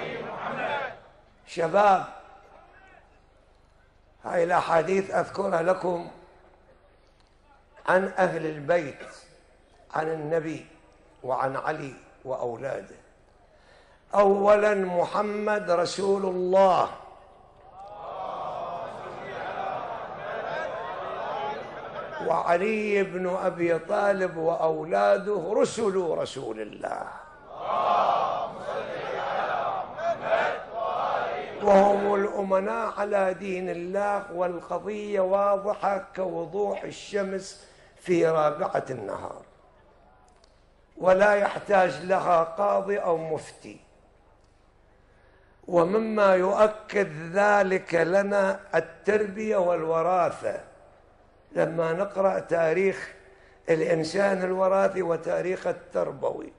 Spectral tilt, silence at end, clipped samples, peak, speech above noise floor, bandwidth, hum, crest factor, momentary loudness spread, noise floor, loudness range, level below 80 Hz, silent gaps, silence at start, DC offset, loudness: -5.5 dB/octave; 0.05 s; under 0.1%; -8 dBFS; 34 dB; 11 kHz; none; 20 dB; 14 LU; -59 dBFS; 7 LU; -60 dBFS; none; 0 s; under 0.1%; -26 LUFS